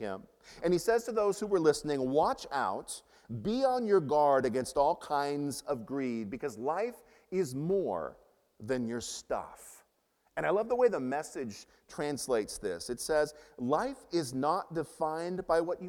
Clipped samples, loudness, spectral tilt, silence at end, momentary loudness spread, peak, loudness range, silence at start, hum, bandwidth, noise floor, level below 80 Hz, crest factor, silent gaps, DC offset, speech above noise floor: under 0.1%; -32 LUFS; -5 dB/octave; 0 s; 12 LU; -14 dBFS; 5 LU; 0 s; none; 17 kHz; -74 dBFS; -62 dBFS; 18 dB; none; under 0.1%; 42 dB